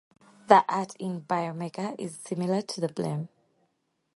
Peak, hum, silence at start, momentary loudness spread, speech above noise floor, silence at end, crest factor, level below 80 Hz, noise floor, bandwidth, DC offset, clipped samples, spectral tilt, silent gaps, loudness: -2 dBFS; none; 0.5 s; 15 LU; 48 dB; 0.9 s; 26 dB; -76 dBFS; -75 dBFS; 11.5 kHz; under 0.1%; under 0.1%; -6 dB/octave; none; -28 LUFS